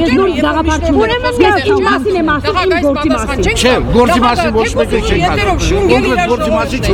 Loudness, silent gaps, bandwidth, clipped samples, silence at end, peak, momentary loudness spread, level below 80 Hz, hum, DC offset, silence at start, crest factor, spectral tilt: -11 LUFS; none; 17.5 kHz; 0.1%; 0 s; 0 dBFS; 3 LU; -22 dBFS; none; under 0.1%; 0 s; 12 dB; -5 dB/octave